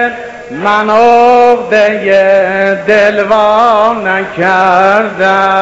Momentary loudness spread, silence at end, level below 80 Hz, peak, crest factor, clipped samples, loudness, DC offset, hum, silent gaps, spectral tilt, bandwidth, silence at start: 7 LU; 0 s; -46 dBFS; 0 dBFS; 8 dB; 0.7%; -8 LUFS; under 0.1%; none; none; -5 dB/octave; 8 kHz; 0 s